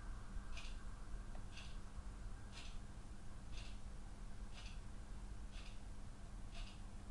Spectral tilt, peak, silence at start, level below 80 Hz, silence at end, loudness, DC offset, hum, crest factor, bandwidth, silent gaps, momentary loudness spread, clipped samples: -4.5 dB/octave; -36 dBFS; 0 s; -52 dBFS; 0 s; -55 LUFS; under 0.1%; none; 14 dB; 11.5 kHz; none; 3 LU; under 0.1%